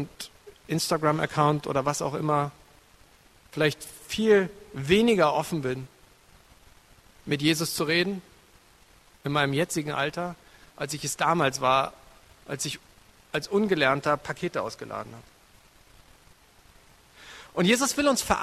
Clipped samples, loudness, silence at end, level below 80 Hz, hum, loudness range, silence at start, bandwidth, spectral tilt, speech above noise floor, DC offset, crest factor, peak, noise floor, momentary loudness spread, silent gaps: under 0.1%; -26 LUFS; 0 s; -56 dBFS; none; 5 LU; 0 s; 14 kHz; -4.5 dB/octave; 31 dB; under 0.1%; 22 dB; -6 dBFS; -57 dBFS; 16 LU; none